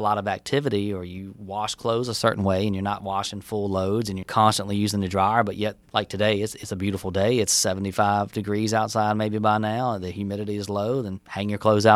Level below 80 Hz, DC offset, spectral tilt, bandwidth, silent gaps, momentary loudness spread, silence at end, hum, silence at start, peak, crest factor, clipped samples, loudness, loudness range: -56 dBFS; under 0.1%; -4.5 dB/octave; 16 kHz; none; 9 LU; 0 s; none; 0 s; -2 dBFS; 22 dB; under 0.1%; -24 LUFS; 3 LU